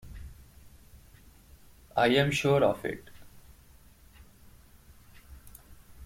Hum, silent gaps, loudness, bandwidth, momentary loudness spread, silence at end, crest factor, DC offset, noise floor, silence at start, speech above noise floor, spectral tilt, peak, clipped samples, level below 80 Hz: none; none; -27 LUFS; 16.5 kHz; 27 LU; 0 s; 22 dB; under 0.1%; -56 dBFS; 0.05 s; 30 dB; -5.5 dB/octave; -10 dBFS; under 0.1%; -54 dBFS